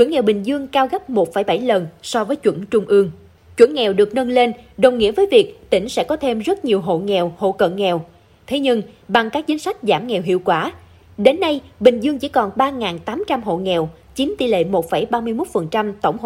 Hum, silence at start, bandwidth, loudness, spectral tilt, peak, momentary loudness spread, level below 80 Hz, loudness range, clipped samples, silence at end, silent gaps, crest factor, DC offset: none; 0 s; 15.5 kHz; -18 LUFS; -5.5 dB/octave; 0 dBFS; 7 LU; -52 dBFS; 4 LU; under 0.1%; 0 s; none; 18 dB; under 0.1%